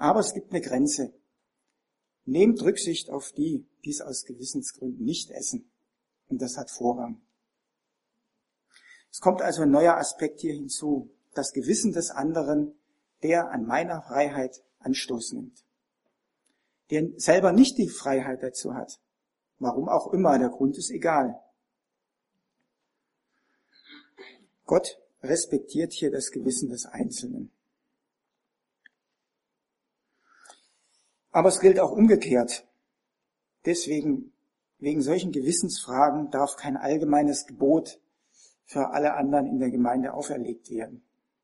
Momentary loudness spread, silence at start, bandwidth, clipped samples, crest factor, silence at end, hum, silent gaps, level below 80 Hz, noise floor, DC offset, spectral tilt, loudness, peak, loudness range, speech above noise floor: 15 LU; 0 s; 11.5 kHz; under 0.1%; 22 dB; 0.45 s; none; none; -68 dBFS; -84 dBFS; under 0.1%; -4.5 dB/octave; -26 LUFS; -6 dBFS; 10 LU; 59 dB